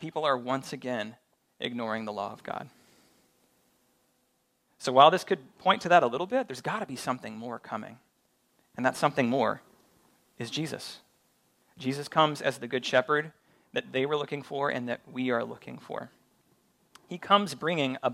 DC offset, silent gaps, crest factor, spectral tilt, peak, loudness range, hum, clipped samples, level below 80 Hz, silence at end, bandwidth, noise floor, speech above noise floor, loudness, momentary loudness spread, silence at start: under 0.1%; none; 26 dB; -4.5 dB/octave; -4 dBFS; 10 LU; none; under 0.1%; -78 dBFS; 0 s; 15.5 kHz; -73 dBFS; 44 dB; -29 LUFS; 17 LU; 0 s